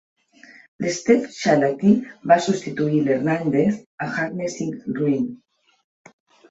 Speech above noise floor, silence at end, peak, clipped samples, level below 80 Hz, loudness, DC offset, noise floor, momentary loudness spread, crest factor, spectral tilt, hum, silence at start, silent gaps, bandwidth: 29 dB; 1.15 s; -2 dBFS; under 0.1%; -62 dBFS; -21 LUFS; under 0.1%; -49 dBFS; 10 LU; 20 dB; -6 dB/octave; none; 0.8 s; 3.86-3.98 s; 8 kHz